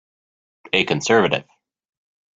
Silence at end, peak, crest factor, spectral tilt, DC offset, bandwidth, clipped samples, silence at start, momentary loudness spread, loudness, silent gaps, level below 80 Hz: 0.95 s; -2 dBFS; 22 dB; -4 dB/octave; under 0.1%; 7.8 kHz; under 0.1%; 0.75 s; 5 LU; -19 LUFS; none; -60 dBFS